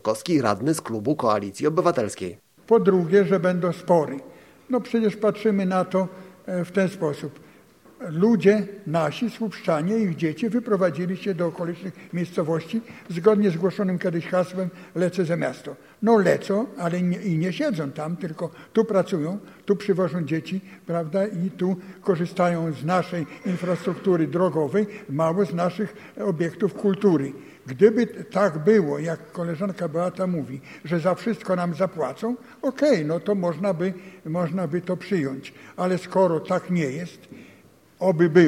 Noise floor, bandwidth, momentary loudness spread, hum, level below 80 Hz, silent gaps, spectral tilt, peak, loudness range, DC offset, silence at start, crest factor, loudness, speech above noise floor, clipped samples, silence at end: -53 dBFS; 14.5 kHz; 11 LU; none; -66 dBFS; none; -7 dB/octave; -2 dBFS; 4 LU; under 0.1%; 0.05 s; 20 dB; -24 LUFS; 30 dB; under 0.1%; 0 s